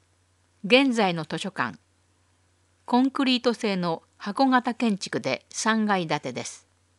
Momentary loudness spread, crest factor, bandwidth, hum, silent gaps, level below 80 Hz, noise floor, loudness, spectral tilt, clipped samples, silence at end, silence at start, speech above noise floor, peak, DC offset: 12 LU; 22 dB; 11.5 kHz; none; none; -76 dBFS; -65 dBFS; -25 LUFS; -4.5 dB/octave; under 0.1%; 0.4 s; 0.65 s; 41 dB; -4 dBFS; under 0.1%